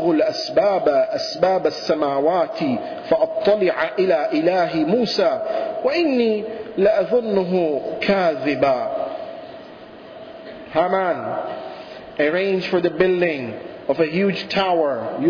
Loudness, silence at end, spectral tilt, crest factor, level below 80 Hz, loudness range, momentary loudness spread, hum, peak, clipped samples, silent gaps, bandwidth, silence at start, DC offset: -20 LUFS; 0 s; -6 dB/octave; 14 dB; -58 dBFS; 4 LU; 16 LU; none; -6 dBFS; under 0.1%; none; 5.4 kHz; 0 s; under 0.1%